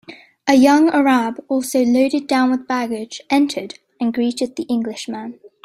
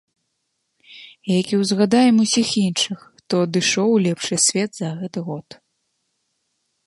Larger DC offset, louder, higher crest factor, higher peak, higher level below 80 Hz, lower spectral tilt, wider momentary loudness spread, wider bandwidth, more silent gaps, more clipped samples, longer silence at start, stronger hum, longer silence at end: neither; about the same, -18 LUFS vs -19 LUFS; about the same, 18 dB vs 16 dB; first, 0 dBFS vs -4 dBFS; about the same, -62 dBFS vs -66 dBFS; about the same, -4 dB/octave vs -4 dB/octave; about the same, 15 LU vs 13 LU; first, 15.5 kHz vs 11.5 kHz; neither; neither; second, 0.1 s vs 0.9 s; neither; second, 0.2 s vs 1.45 s